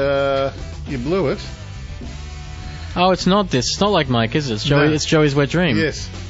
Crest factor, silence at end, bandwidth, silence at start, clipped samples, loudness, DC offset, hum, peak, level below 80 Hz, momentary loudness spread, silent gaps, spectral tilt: 16 dB; 0 s; 8 kHz; 0 s; under 0.1%; -18 LUFS; under 0.1%; none; -2 dBFS; -34 dBFS; 17 LU; none; -5 dB/octave